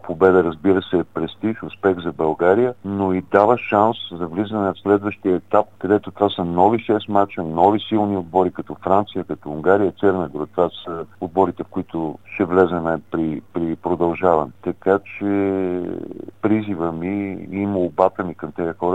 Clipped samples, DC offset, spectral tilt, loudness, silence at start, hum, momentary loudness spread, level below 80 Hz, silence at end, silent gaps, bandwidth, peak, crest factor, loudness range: under 0.1%; 0.4%; -8.5 dB/octave; -20 LUFS; 0.05 s; none; 10 LU; -52 dBFS; 0 s; none; 7.8 kHz; 0 dBFS; 20 dB; 3 LU